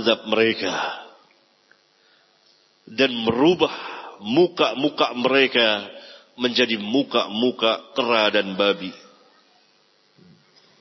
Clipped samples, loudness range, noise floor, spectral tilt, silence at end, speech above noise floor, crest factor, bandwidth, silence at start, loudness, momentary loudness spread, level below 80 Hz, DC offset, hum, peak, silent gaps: under 0.1%; 4 LU; -60 dBFS; -4.5 dB/octave; 1.85 s; 40 dB; 20 dB; 6.2 kHz; 0 s; -20 LUFS; 14 LU; -66 dBFS; under 0.1%; none; -2 dBFS; none